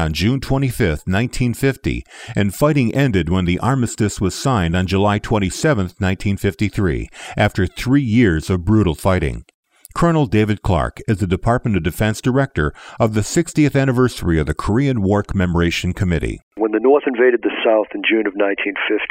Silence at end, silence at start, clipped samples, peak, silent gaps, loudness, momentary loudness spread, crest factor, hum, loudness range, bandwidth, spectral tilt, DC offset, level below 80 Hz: 0 s; 0 s; under 0.1%; -4 dBFS; 9.54-9.63 s, 16.43-16.51 s; -18 LUFS; 6 LU; 14 dB; none; 2 LU; 16 kHz; -6.5 dB/octave; under 0.1%; -32 dBFS